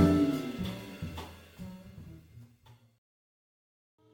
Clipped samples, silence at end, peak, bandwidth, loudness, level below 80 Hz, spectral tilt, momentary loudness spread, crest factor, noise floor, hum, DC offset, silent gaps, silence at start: under 0.1%; 1.4 s; -12 dBFS; 17 kHz; -33 LUFS; -54 dBFS; -7.5 dB/octave; 24 LU; 22 dB; -60 dBFS; none; under 0.1%; none; 0 s